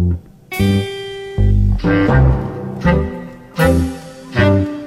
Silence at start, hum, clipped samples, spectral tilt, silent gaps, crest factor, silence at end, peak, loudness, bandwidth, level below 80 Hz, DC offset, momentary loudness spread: 0 s; none; under 0.1%; -7.5 dB/octave; none; 14 dB; 0 s; 0 dBFS; -16 LUFS; 15.5 kHz; -22 dBFS; under 0.1%; 13 LU